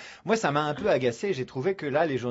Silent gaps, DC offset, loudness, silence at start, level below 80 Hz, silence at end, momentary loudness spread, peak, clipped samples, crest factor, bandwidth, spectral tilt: none; under 0.1%; -27 LUFS; 0 s; -62 dBFS; 0 s; 5 LU; -10 dBFS; under 0.1%; 16 dB; 8 kHz; -5.5 dB/octave